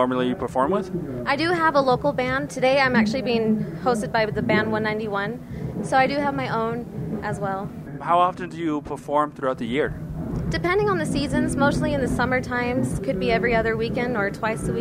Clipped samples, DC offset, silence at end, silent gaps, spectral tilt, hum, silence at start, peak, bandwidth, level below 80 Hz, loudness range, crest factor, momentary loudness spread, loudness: under 0.1%; under 0.1%; 0 s; none; -6 dB/octave; none; 0 s; -6 dBFS; 15.5 kHz; -42 dBFS; 4 LU; 16 dB; 9 LU; -23 LUFS